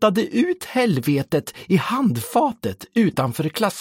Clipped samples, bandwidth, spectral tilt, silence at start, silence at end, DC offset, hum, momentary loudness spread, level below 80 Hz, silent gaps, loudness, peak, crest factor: under 0.1%; 17 kHz; -6 dB/octave; 0 s; 0 s; under 0.1%; none; 5 LU; -58 dBFS; none; -21 LUFS; -4 dBFS; 16 dB